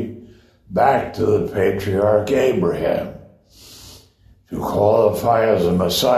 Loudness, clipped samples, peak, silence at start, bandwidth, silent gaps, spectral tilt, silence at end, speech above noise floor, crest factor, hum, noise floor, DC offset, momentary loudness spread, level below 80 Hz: -18 LUFS; under 0.1%; -2 dBFS; 0 s; 13.5 kHz; none; -5.5 dB/octave; 0 s; 35 dB; 16 dB; none; -52 dBFS; under 0.1%; 11 LU; -46 dBFS